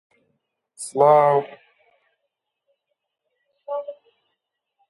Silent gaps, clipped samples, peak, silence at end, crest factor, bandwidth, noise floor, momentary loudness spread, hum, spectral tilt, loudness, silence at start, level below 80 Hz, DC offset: none; under 0.1%; -4 dBFS; 0.95 s; 22 dB; 11.5 kHz; -79 dBFS; 23 LU; none; -5.5 dB/octave; -19 LUFS; 0.8 s; -80 dBFS; under 0.1%